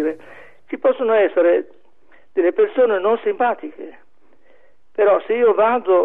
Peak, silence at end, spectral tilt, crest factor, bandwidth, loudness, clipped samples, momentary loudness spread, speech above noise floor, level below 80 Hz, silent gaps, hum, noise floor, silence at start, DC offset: -6 dBFS; 0 s; -7.5 dB/octave; 12 dB; 3.9 kHz; -18 LUFS; under 0.1%; 18 LU; 41 dB; -70 dBFS; none; none; -58 dBFS; 0 s; 0.7%